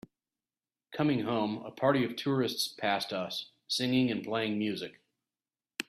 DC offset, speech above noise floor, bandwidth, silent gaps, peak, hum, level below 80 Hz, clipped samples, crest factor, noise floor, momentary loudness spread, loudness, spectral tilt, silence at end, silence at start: under 0.1%; over 59 dB; 14.5 kHz; none; -12 dBFS; none; -72 dBFS; under 0.1%; 20 dB; under -90 dBFS; 10 LU; -31 LUFS; -5 dB/octave; 0.05 s; 0.9 s